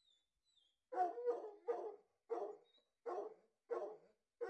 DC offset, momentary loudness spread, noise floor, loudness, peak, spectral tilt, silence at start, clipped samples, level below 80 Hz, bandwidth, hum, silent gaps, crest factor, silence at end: under 0.1%; 13 LU; -81 dBFS; -47 LUFS; -28 dBFS; -4.5 dB/octave; 0.9 s; under 0.1%; under -90 dBFS; 8.4 kHz; none; none; 18 dB; 0 s